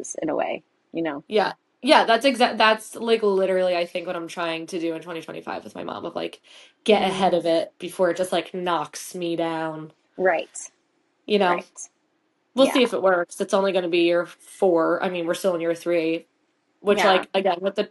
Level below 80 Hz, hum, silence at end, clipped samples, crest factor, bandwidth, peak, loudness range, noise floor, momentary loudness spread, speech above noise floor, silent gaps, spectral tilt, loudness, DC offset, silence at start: -70 dBFS; none; 0.05 s; under 0.1%; 22 dB; 12 kHz; -2 dBFS; 6 LU; -69 dBFS; 15 LU; 47 dB; none; -4 dB/octave; -23 LUFS; under 0.1%; 0 s